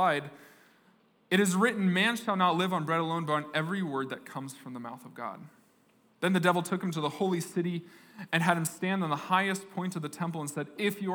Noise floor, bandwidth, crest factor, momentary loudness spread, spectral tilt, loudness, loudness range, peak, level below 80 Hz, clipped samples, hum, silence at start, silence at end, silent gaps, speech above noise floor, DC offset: -66 dBFS; over 20 kHz; 22 dB; 15 LU; -5 dB/octave; -30 LUFS; 5 LU; -10 dBFS; -88 dBFS; under 0.1%; none; 0 s; 0 s; none; 35 dB; under 0.1%